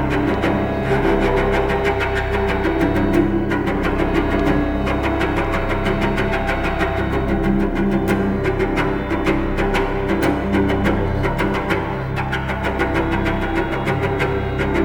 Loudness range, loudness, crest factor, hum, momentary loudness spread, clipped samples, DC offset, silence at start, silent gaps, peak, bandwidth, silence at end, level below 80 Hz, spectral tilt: 2 LU; -19 LUFS; 14 dB; none; 3 LU; under 0.1%; under 0.1%; 0 s; none; -4 dBFS; 18.5 kHz; 0 s; -26 dBFS; -7 dB/octave